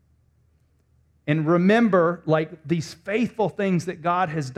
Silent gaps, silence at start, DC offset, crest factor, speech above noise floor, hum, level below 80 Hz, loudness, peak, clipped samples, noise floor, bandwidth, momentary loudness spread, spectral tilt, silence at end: none; 1.25 s; under 0.1%; 16 dB; 41 dB; none; -62 dBFS; -22 LUFS; -6 dBFS; under 0.1%; -63 dBFS; 11.5 kHz; 10 LU; -7 dB/octave; 0.05 s